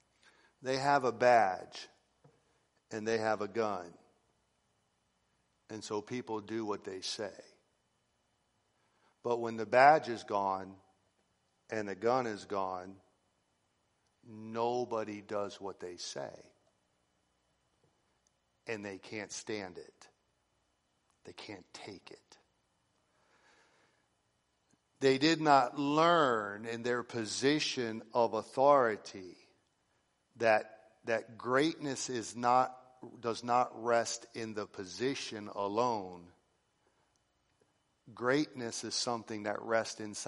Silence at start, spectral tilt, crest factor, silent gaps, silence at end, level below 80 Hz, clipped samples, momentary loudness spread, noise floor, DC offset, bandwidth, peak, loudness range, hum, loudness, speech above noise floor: 0.6 s; -4 dB/octave; 24 dB; none; 0 s; -80 dBFS; under 0.1%; 21 LU; -78 dBFS; under 0.1%; 11.5 kHz; -12 dBFS; 16 LU; none; -33 LUFS; 45 dB